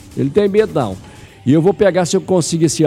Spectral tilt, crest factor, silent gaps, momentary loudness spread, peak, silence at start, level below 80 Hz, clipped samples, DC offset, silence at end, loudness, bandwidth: -5.5 dB/octave; 12 dB; none; 9 LU; -2 dBFS; 0.05 s; -46 dBFS; under 0.1%; under 0.1%; 0 s; -15 LUFS; 14.5 kHz